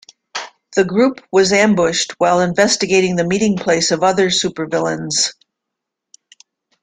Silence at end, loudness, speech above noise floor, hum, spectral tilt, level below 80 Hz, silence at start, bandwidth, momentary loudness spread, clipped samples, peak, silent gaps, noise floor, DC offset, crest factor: 1.5 s; -15 LUFS; 65 dB; none; -3.5 dB/octave; -56 dBFS; 0.35 s; 9.6 kHz; 7 LU; under 0.1%; 0 dBFS; none; -80 dBFS; under 0.1%; 16 dB